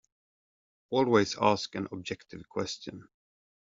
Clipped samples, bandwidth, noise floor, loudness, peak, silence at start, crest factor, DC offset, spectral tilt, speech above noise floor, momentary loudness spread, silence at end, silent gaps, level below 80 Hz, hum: under 0.1%; 7.8 kHz; under -90 dBFS; -30 LUFS; -10 dBFS; 0.9 s; 22 dB; under 0.1%; -4 dB/octave; over 60 dB; 15 LU; 0.65 s; none; -68 dBFS; none